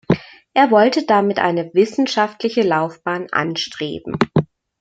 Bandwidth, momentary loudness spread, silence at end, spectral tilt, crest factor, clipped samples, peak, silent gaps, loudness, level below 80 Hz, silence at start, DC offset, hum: 9 kHz; 10 LU; 0.35 s; -6 dB/octave; 16 dB; under 0.1%; 0 dBFS; none; -18 LUFS; -54 dBFS; 0.1 s; under 0.1%; none